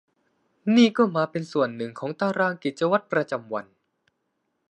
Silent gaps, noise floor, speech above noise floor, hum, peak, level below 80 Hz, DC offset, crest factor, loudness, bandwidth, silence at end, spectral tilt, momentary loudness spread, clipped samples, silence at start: none; -76 dBFS; 53 dB; none; -6 dBFS; -74 dBFS; under 0.1%; 18 dB; -24 LUFS; 9 kHz; 1.1 s; -6 dB/octave; 13 LU; under 0.1%; 0.65 s